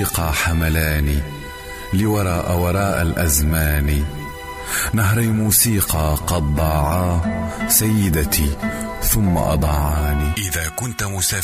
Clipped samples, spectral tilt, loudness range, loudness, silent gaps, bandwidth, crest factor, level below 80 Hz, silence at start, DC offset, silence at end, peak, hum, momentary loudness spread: under 0.1%; -4.5 dB/octave; 2 LU; -18 LUFS; none; 15.5 kHz; 16 dB; -26 dBFS; 0 s; under 0.1%; 0 s; -2 dBFS; none; 9 LU